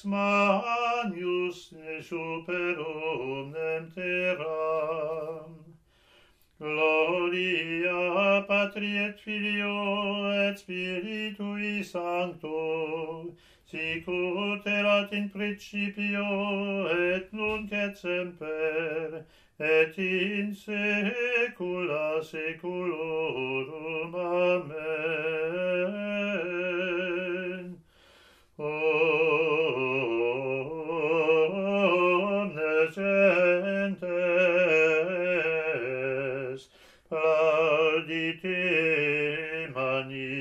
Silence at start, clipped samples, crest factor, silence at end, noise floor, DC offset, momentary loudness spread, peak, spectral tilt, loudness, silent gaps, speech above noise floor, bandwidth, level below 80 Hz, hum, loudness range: 0.05 s; under 0.1%; 18 dB; 0 s; -61 dBFS; under 0.1%; 10 LU; -10 dBFS; -6 dB/octave; -28 LUFS; none; 32 dB; 10.5 kHz; -68 dBFS; none; 7 LU